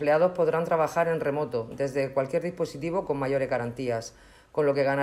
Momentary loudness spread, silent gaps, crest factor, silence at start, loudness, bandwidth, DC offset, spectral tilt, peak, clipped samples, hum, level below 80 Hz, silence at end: 8 LU; none; 16 dB; 0 s; -27 LUFS; 13.5 kHz; under 0.1%; -6.5 dB/octave; -12 dBFS; under 0.1%; none; -60 dBFS; 0 s